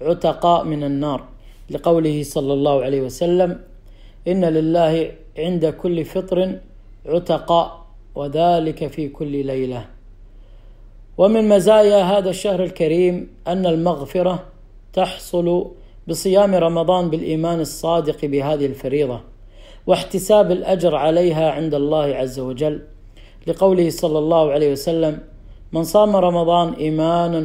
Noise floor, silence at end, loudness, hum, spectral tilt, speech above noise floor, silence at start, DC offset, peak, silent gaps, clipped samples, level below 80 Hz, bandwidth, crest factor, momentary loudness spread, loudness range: -41 dBFS; 0 s; -18 LUFS; none; -6.5 dB/octave; 24 dB; 0 s; under 0.1%; -2 dBFS; none; under 0.1%; -42 dBFS; 16 kHz; 16 dB; 12 LU; 5 LU